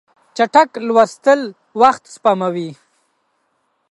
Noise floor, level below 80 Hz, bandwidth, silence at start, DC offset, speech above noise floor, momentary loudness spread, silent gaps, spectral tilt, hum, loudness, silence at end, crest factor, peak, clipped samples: -66 dBFS; -66 dBFS; 11.5 kHz; 0.35 s; under 0.1%; 52 dB; 13 LU; none; -5 dB/octave; none; -15 LUFS; 1.15 s; 16 dB; 0 dBFS; under 0.1%